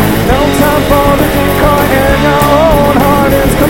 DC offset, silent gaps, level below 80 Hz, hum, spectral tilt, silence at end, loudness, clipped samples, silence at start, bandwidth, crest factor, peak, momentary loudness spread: 4%; none; -18 dBFS; none; -5.5 dB/octave; 0 s; -8 LUFS; 0.4%; 0 s; 18 kHz; 8 dB; 0 dBFS; 2 LU